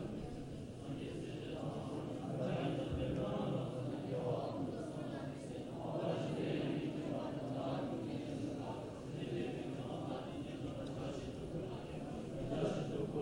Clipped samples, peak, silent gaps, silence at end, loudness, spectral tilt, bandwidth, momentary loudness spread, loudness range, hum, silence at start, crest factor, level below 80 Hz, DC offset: under 0.1%; -26 dBFS; none; 0 s; -42 LUFS; -7.5 dB/octave; 16 kHz; 7 LU; 3 LU; none; 0 s; 16 dB; -60 dBFS; under 0.1%